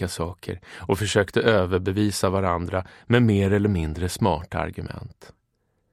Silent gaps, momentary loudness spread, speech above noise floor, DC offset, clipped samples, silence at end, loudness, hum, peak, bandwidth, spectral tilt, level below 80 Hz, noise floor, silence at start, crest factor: none; 15 LU; 48 dB; under 0.1%; under 0.1%; 0.85 s; -23 LUFS; none; -2 dBFS; 15 kHz; -6 dB/octave; -44 dBFS; -71 dBFS; 0 s; 20 dB